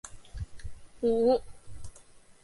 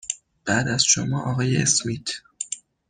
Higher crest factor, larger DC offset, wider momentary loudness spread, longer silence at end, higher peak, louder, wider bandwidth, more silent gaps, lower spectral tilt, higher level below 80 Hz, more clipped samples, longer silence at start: about the same, 18 dB vs 20 dB; neither; first, 24 LU vs 13 LU; second, 0.1 s vs 0.3 s; second, -14 dBFS vs -4 dBFS; second, -28 LUFS vs -22 LUFS; about the same, 11.5 kHz vs 10.5 kHz; neither; first, -6.5 dB/octave vs -3 dB/octave; first, -48 dBFS vs -56 dBFS; neither; about the same, 0.05 s vs 0.05 s